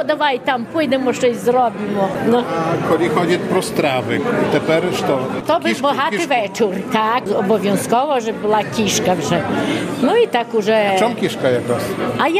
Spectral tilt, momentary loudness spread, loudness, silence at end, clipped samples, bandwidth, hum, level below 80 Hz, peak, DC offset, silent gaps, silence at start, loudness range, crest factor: -5 dB/octave; 3 LU; -17 LUFS; 0 s; under 0.1%; 15.5 kHz; none; -54 dBFS; -2 dBFS; under 0.1%; none; 0 s; 1 LU; 16 dB